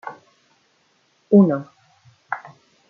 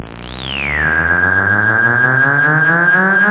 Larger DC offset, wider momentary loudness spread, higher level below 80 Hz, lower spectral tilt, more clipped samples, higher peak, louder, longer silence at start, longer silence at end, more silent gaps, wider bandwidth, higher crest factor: neither; first, 17 LU vs 9 LU; second, -68 dBFS vs -36 dBFS; first, -10.5 dB/octave vs -9 dB/octave; neither; about the same, -4 dBFS vs -2 dBFS; second, -19 LUFS vs -11 LUFS; about the same, 0.05 s vs 0 s; first, 0.5 s vs 0 s; neither; second, 3.1 kHz vs 4 kHz; first, 20 dB vs 12 dB